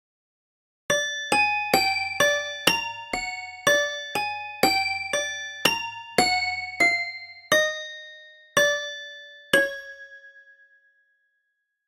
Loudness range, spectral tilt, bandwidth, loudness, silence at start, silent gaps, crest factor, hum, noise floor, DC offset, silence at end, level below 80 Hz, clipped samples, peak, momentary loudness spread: 4 LU; -1.5 dB/octave; 16 kHz; -23 LUFS; 0.9 s; none; 24 dB; none; -77 dBFS; under 0.1%; 1.45 s; -60 dBFS; under 0.1%; -2 dBFS; 16 LU